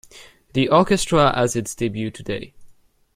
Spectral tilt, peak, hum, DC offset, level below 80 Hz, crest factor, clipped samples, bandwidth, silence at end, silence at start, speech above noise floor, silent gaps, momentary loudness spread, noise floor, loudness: -5 dB/octave; -2 dBFS; none; under 0.1%; -44 dBFS; 20 dB; under 0.1%; 16 kHz; 0.45 s; 0.15 s; 31 dB; none; 13 LU; -51 dBFS; -20 LUFS